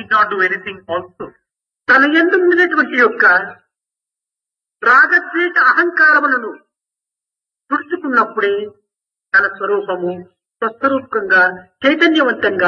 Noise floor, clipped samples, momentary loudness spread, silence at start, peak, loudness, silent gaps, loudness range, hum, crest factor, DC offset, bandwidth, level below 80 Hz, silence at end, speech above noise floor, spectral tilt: -87 dBFS; under 0.1%; 14 LU; 0 s; 0 dBFS; -13 LUFS; none; 5 LU; none; 14 dB; under 0.1%; 7.2 kHz; -66 dBFS; 0 s; 73 dB; -5 dB/octave